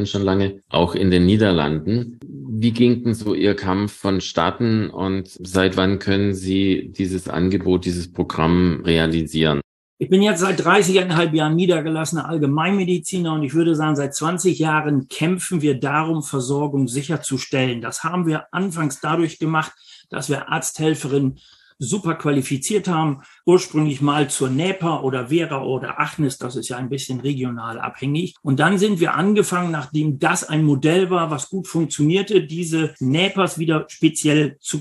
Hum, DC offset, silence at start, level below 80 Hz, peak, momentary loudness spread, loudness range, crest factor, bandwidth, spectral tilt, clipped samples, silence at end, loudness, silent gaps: none; under 0.1%; 0 s; -48 dBFS; -2 dBFS; 8 LU; 5 LU; 18 dB; 12.5 kHz; -5.5 dB/octave; under 0.1%; 0 s; -20 LUFS; 9.64-9.97 s